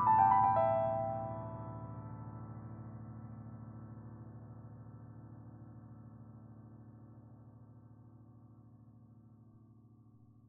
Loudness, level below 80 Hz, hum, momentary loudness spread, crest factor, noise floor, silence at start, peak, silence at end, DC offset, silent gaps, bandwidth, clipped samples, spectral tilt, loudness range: -35 LUFS; -66 dBFS; none; 28 LU; 22 dB; -62 dBFS; 0 s; -16 dBFS; 1.3 s; under 0.1%; none; 3.8 kHz; under 0.1%; -8 dB/octave; 22 LU